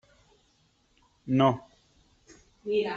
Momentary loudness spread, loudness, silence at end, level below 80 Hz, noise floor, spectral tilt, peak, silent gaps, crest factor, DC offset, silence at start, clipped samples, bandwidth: 19 LU; -27 LUFS; 0 s; -66 dBFS; -68 dBFS; -7.5 dB/octave; -8 dBFS; none; 22 dB; under 0.1%; 1.25 s; under 0.1%; 7.6 kHz